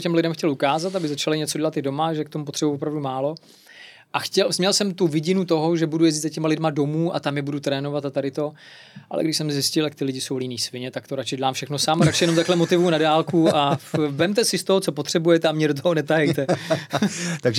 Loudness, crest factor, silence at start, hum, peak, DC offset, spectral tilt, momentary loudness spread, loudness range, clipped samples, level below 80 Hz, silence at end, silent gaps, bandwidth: -22 LUFS; 16 dB; 0 s; none; -6 dBFS; under 0.1%; -4.5 dB/octave; 8 LU; 6 LU; under 0.1%; -66 dBFS; 0 s; none; 16 kHz